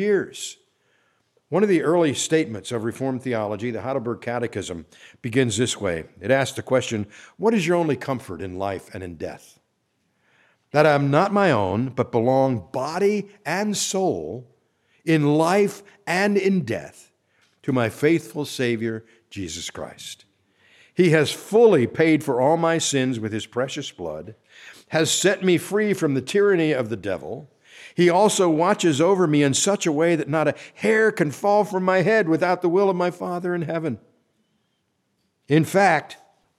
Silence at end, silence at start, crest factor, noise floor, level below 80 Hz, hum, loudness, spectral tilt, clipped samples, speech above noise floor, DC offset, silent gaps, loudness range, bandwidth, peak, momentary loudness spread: 0.45 s; 0 s; 20 dB; -71 dBFS; -62 dBFS; none; -21 LUFS; -5 dB/octave; under 0.1%; 50 dB; under 0.1%; none; 6 LU; 15 kHz; -2 dBFS; 15 LU